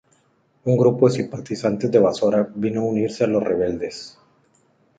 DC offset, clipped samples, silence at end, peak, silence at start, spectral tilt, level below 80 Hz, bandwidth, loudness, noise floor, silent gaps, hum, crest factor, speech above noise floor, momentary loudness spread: under 0.1%; under 0.1%; 0.9 s; -4 dBFS; 0.65 s; -7 dB/octave; -56 dBFS; 9.2 kHz; -20 LUFS; -62 dBFS; none; none; 18 dB; 43 dB; 12 LU